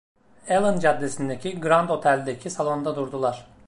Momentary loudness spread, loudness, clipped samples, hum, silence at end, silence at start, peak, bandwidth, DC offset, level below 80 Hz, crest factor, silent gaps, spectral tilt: 9 LU; -24 LUFS; under 0.1%; none; 0 s; 0.15 s; -6 dBFS; 11.5 kHz; under 0.1%; -60 dBFS; 18 dB; none; -5.5 dB/octave